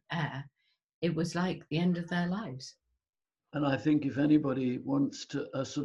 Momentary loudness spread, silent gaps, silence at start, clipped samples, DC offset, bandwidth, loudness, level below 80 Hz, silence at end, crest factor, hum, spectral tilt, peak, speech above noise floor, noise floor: 12 LU; 0.94-1.02 s; 0.1 s; under 0.1%; under 0.1%; 11.5 kHz; -32 LUFS; -68 dBFS; 0 s; 18 dB; none; -6.5 dB/octave; -14 dBFS; 35 dB; -66 dBFS